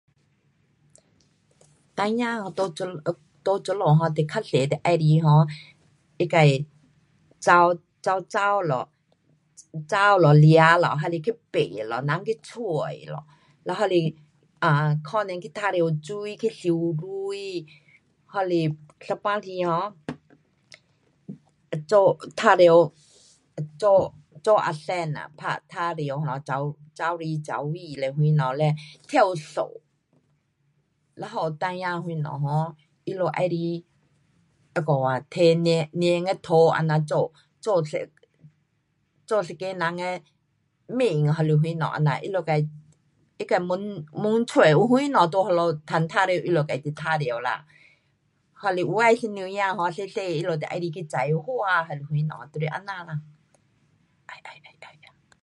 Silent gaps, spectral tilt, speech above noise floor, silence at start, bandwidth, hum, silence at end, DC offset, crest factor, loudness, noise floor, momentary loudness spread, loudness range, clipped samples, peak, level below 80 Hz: none; -7 dB/octave; 48 dB; 1.95 s; 11 kHz; none; 0.55 s; under 0.1%; 22 dB; -24 LUFS; -71 dBFS; 14 LU; 8 LU; under 0.1%; -2 dBFS; -68 dBFS